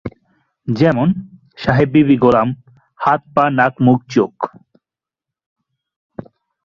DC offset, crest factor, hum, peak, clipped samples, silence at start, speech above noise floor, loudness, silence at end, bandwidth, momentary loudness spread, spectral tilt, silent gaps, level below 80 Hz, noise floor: under 0.1%; 16 dB; none; 0 dBFS; under 0.1%; 0.05 s; 73 dB; -15 LUFS; 0.45 s; 7 kHz; 20 LU; -8.5 dB/octave; 5.46-5.56 s, 5.96-6.10 s; -48 dBFS; -87 dBFS